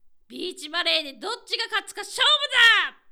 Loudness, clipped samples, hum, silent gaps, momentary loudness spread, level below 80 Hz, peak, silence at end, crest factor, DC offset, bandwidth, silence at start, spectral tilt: -20 LUFS; under 0.1%; none; none; 18 LU; -66 dBFS; -6 dBFS; 0.2 s; 18 dB; under 0.1%; over 20 kHz; 0.3 s; 1 dB/octave